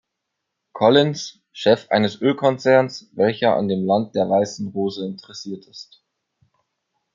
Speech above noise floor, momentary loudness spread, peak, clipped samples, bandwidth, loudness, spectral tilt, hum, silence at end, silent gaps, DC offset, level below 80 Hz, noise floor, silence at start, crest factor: 60 dB; 17 LU; -2 dBFS; under 0.1%; 7.6 kHz; -19 LUFS; -5.5 dB/octave; none; 1.3 s; none; under 0.1%; -68 dBFS; -79 dBFS; 0.75 s; 20 dB